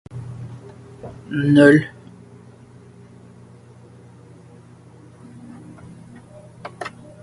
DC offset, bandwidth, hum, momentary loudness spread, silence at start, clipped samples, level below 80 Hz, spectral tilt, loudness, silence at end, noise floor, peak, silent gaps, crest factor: under 0.1%; 11.5 kHz; none; 30 LU; 0.15 s; under 0.1%; -56 dBFS; -7.5 dB/octave; -16 LUFS; 0.35 s; -45 dBFS; 0 dBFS; none; 24 dB